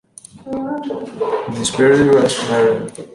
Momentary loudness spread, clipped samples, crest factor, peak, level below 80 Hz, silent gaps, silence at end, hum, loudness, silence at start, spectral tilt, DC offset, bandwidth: 14 LU; under 0.1%; 14 dB; -2 dBFS; -50 dBFS; none; 0.05 s; none; -16 LUFS; 0.35 s; -4.5 dB/octave; under 0.1%; 11.5 kHz